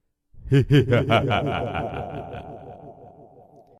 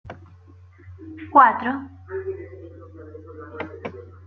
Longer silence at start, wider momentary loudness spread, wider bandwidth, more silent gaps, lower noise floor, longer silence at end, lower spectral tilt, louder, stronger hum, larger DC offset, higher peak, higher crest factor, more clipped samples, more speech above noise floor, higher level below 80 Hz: first, 0.35 s vs 0.05 s; second, 22 LU vs 27 LU; first, 10 kHz vs 6 kHz; neither; about the same, -51 dBFS vs -48 dBFS; first, 0.7 s vs 0.2 s; about the same, -7.5 dB/octave vs -8 dB/octave; about the same, -22 LUFS vs -20 LUFS; neither; neither; second, -6 dBFS vs -2 dBFS; second, 18 dB vs 24 dB; neither; about the same, 30 dB vs 29 dB; first, -46 dBFS vs -64 dBFS